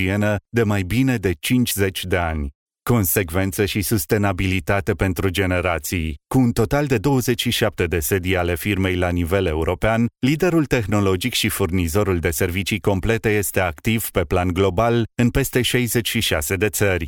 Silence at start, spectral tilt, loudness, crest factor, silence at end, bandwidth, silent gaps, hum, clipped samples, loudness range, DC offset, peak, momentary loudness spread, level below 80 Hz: 0 s; -5 dB/octave; -20 LUFS; 16 dB; 0 s; 19.5 kHz; 2.55-2.66 s; none; under 0.1%; 1 LU; under 0.1%; -4 dBFS; 3 LU; -38 dBFS